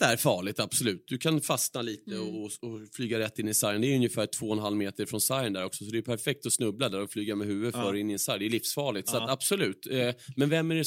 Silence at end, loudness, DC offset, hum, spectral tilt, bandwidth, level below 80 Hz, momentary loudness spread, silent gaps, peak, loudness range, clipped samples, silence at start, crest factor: 0 s; -30 LUFS; under 0.1%; none; -3.5 dB/octave; 16.5 kHz; -72 dBFS; 8 LU; none; -6 dBFS; 1 LU; under 0.1%; 0 s; 22 dB